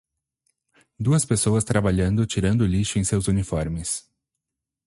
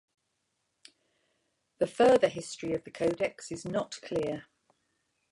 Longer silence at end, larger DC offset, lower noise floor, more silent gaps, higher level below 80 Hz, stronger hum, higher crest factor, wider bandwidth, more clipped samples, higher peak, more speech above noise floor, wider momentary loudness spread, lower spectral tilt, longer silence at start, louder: about the same, 0.9 s vs 0.9 s; neither; first, -84 dBFS vs -80 dBFS; neither; first, -40 dBFS vs -66 dBFS; neither; about the same, 18 dB vs 20 dB; about the same, 11.5 kHz vs 11.5 kHz; neither; first, -6 dBFS vs -12 dBFS; first, 63 dB vs 51 dB; second, 7 LU vs 13 LU; about the same, -5.5 dB/octave vs -5 dB/octave; second, 1 s vs 1.8 s; first, -23 LUFS vs -30 LUFS